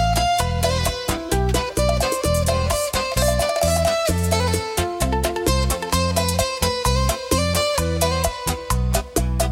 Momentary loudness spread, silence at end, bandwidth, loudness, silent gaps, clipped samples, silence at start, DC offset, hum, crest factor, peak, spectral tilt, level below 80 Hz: 3 LU; 0 s; 17 kHz; -20 LUFS; none; under 0.1%; 0 s; under 0.1%; none; 16 dB; -4 dBFS; -4 dB/octave; -28 dBFS